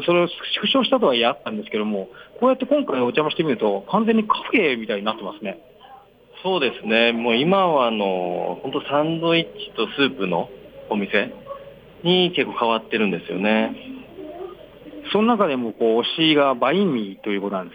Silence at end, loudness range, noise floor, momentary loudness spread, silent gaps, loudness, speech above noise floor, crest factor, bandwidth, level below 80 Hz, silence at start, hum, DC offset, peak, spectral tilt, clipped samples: 0 s; 3 LU; -47 dBFS; 16 LU; none; -21 LUFS; 27 dB; 16 dB; 15 kHz; -62 dBFS; 0 s; none; under 0.1%; -4 dBFS; -7.5 dB/octave; under 0.1%